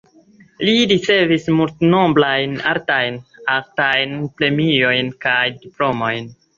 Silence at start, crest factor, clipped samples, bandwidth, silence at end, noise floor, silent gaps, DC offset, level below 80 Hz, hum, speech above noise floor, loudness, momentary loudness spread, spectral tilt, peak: 0.6 s; 16 dB; under 0.1%; 7.6 kHz; 0.25 s; -49 dBFS; none; under 0.1%; -56 dBFS; none; 32 dB; -17 LUFS; 8 LU; -5.5 dB/octave; -2 dBFS